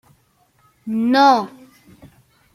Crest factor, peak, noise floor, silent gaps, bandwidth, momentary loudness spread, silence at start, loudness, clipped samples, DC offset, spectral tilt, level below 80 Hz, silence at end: 18 dB; -2 dBFS; -60 dBFS; none; 15 kHz; 21 LU; 0.85 s; -16 LUFS; under 0.1%; under 0.1%; -5 dB/octave; -64 dBFS; 1.1 s